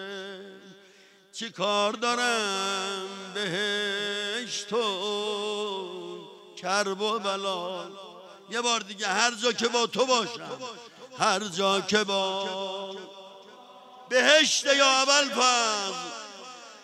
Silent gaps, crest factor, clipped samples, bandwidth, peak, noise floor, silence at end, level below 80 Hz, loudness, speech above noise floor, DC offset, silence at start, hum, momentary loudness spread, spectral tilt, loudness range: none; 26 dB; under 0.1%; 15 kHz; -4 dBFS; -56 dBFS; 0 s; -84 dBFS; -25 LUFS; 30 dB; under 0.1%; 0 s; none; 21 LU; -1.5 dB/octave; 7 LU